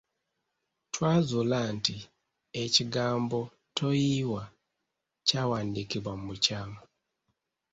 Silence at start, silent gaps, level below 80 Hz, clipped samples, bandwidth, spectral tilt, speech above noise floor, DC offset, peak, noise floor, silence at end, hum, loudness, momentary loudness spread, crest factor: 0.95 s; none; -62 dBFS; under 0.1%; 8 kHz; -4.5 dB/octave; 55 dB; under 0.1%; -8 dBFS; -84 dBFS; 0.9 s; none; -29 LUFS; 13 LU; 24 dB